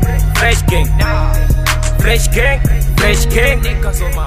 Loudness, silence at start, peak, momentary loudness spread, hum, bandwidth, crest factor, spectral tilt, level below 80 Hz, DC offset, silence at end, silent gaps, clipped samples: -13 LUFS; 0 s; 0 dBFS; 3 LU; none; 16 kHz; 12 dB; -4.5 dB/octave; -14 dBFS; 2%; 0 s; none; under 0.1%